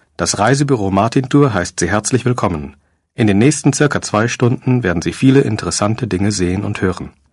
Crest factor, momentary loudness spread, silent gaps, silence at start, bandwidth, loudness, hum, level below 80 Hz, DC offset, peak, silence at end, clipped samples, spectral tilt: 14 dB; 6 LU; none; 0.2 s; 11.5 kHz; -15 LUFS; none; -36 dBFS; under 0.1%; 0 dBFS; 0.2 s; under 0.1%; -5.5 dB/octave